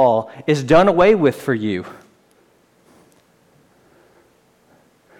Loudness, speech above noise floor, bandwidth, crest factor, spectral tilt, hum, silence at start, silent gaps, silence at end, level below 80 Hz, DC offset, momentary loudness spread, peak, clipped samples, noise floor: -16 LUFS; 41 dB; 15.5 kHz; 16 dB; -6.5 dB/octave; none; 0 s; none; 3.25 s; -48 dBFS; under 0.1%; 12 LU; -4 dBFS; under 0.1%; -56 dBFS